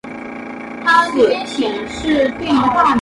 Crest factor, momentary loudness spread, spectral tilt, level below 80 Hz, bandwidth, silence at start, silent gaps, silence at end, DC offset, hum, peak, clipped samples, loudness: 16 dB; 16 LU; -4.5 dB/octave; -44 dBFS; 11.5 kHz; 0.05 s; none; 0 s; under 0.1%; none; 0 dBFS; under 0.1%; -15 LUFS